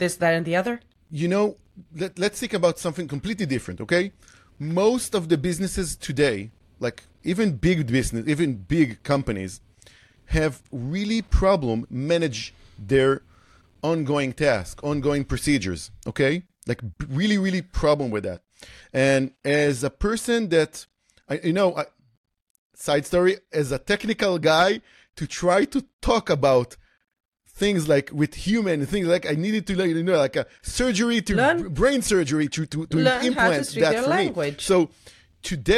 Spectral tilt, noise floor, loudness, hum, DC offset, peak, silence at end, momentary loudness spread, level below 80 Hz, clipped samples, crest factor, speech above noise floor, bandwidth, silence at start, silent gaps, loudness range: -5 dB/octave; -55 dBFS; -23 LUFS; none; under 0.1%; -6 dBFS; 0 s; 11 LU; -40 dBFS; under 0.1%; 16 dB; 33 dB; 15 kHz; 0 s; 22.17-22.24 s, 22.42-22.70 s, 25.93-25.99 s, 27.20-27.32 s; 4 LU